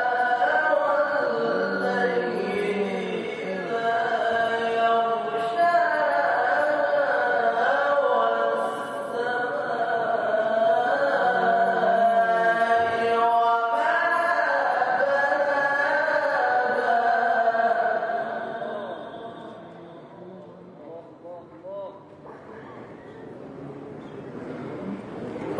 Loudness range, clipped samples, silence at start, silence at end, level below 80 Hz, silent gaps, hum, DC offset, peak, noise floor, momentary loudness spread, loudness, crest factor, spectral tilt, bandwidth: 19 LU; under 0.1%; 0 s; 0 s; -70 dBFS; none; none; under 0.1%; -10 dBFS; -44 dBFS; 21 LU; -23 LUFS; 14 dB; -5 dB/octave; 11 kHz